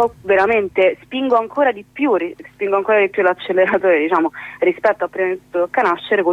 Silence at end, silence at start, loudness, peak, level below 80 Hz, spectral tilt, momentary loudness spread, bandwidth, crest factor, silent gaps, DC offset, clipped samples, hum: 0 s; 0 s; -17 LUFS; -4 dBFS; -56 dBFS; -6.5 dB/octave; 7 LU; 7.2 kHz; 14 dB; none; under 0.1%; under 0.1%; 50 Hz at -60 dBFS